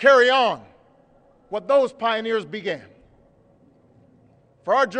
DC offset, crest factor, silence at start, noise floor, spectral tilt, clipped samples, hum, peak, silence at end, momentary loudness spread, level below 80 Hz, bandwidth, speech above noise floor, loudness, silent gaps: under 0.1%; 18 dB; 0 s; -56 dBFS; -3.5 dB/octave; under 0.1%; none; -4 dBFS; 0 s; 18 LU; -68 dBFS; 9.2 kHz; 37 dB; -21 LUFS; none